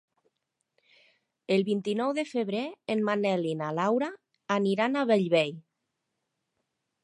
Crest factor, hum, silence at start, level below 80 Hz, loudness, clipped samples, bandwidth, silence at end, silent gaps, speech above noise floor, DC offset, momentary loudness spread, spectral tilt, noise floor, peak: 18 dB; none; 1.5 s; -82 dBFS; -28 LUFS; under 0.1%; 11 kHz; 1.45 s; none; 55 dB; under 0.1%; 8 LU; -6 dB/octave; -82 dBFS; -12 dBFS